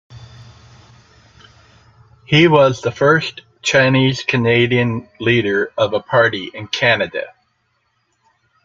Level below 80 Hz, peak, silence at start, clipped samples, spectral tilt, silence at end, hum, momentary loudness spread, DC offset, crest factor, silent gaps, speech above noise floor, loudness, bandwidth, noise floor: -54 dBFS; 0 dBFS; 0.1 s; under 0.1%; -5.5 dB/octave; 1.35 s; none; 11 LU; under 0.1%; 18 dB; none; 50 dB; -15 LUFS; 7.6 kHz; -65 dBFS